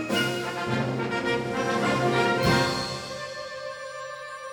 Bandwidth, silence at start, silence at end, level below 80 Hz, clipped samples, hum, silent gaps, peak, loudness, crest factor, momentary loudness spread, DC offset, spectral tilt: 19.5 kHz; 0 s; 0 s; -52 dBFS; under 0.1%; none; none; -10 dBFS; -27 LUFS; 18 dB; 14 LU; under 0.1%; -4.5 dB/octave